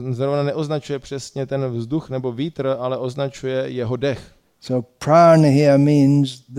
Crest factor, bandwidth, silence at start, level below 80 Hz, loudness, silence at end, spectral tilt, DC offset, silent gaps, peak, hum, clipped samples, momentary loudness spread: 16 dB; 11.5 kHz; 0 s; -56 dBFS; -19 LUFS; 0 s; -7.5 dB/octave; under 0.1%; none; -2 dBFS; none; under 0.1%; 13 LU